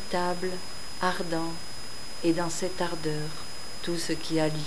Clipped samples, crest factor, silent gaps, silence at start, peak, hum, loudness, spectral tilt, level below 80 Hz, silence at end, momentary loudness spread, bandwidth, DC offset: under 0.1%; 20 dB; none; 0 s; -10 dBFS; none; -31 LUFS; -4.5 dB/octave; -54 dBFS; 0 s; 11 LU; 11 kHz; 3%